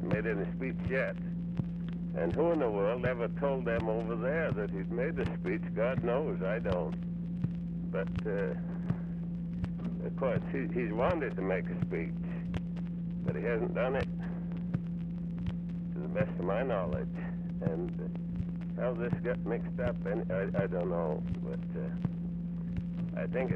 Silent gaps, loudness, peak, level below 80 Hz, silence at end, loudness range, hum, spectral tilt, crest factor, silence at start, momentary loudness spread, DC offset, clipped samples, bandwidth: none; -34 LUFS; -16 dBFS; -50 dBFS; 0 s; 3 LU; none; -10 dB/octave; 16 dB; 0 s; 6 LU; under 0.1%; under 0.1%; 4.3 kHz